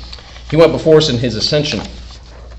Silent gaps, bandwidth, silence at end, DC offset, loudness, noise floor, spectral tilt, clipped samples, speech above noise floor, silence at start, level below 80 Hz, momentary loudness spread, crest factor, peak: none; 8.6 kHz; 0 s; under 0.1%; -13 LUFS; -33 dBFS; -5.5 dB/octave; 0.6%; 21 dB; 0 s; -34 dBFS; 22 LU; 14 dB; 0 dBFS